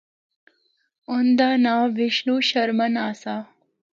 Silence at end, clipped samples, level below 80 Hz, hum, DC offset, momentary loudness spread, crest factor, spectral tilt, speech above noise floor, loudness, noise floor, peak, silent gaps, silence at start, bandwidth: 0.55 s; under 0.1%; -74 dBFS; none; under 0.1%; 11 LU; 16 dB; -4.5 dB/octave; 47 dB; -21 LUFS; -68 dBFS; -8 dBFS; none; 1.1 s; 7.4 kHz